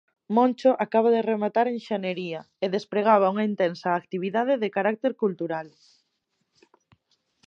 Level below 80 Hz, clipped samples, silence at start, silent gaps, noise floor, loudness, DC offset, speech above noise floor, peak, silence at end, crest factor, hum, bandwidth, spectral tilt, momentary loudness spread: -80 dBFS; under 0.1%; 0.3 s; none; -76 dBFS; -25 LUFS; under 0.1%; 52 dB; -6 dBFS; 1.8 s; 20 dB; none; 7.4 kHz; -7 dB/octave; 10 LU